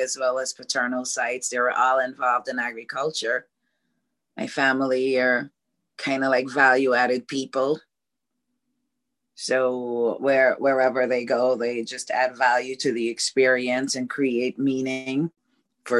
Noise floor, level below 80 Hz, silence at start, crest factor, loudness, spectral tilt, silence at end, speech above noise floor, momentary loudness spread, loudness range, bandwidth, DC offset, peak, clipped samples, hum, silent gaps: -84 dBFS; -76 dBFS; 0 s; 18 dB; -23 LUFS; -3 dB/octave; 0 s; 61 dB; 8 LU; 3 LU; 12 kHz; under 0.1%; -6 dBFS; under 0.1%; none; none